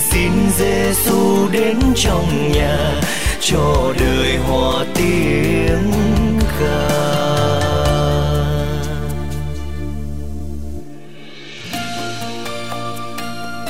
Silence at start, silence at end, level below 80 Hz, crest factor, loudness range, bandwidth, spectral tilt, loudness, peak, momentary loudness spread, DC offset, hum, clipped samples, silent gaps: 0 s; 0 s; -26 dBFS; 12 dB; 11 LU; 16.5 kHz; -5 dB/octave; -17 LUFS; -4 dBFS; 13 LU; 5%; none; under 0.1%; none